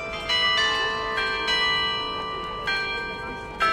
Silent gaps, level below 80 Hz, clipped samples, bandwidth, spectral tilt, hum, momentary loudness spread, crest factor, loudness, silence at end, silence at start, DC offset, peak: none; -46 dBFS; under 0.1%; 16 kHz; -2 dB/octave; none; 10 LU; 14 dB; -23 LUFS; 0 s; 0 s; under 0.1%; -12 dBFS